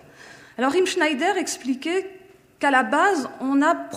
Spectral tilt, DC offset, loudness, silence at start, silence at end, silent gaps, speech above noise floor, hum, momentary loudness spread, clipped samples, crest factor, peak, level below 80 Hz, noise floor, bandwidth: -2.5 dB/octave; under 0.1%; -22 LUFS; 0.25 s; 0 s; none; 25 dB; none; 7 LU; under 0.1%; 18 dB; -4 dBFS; -70 dBFS; -46 dBFS; 15.5 kHz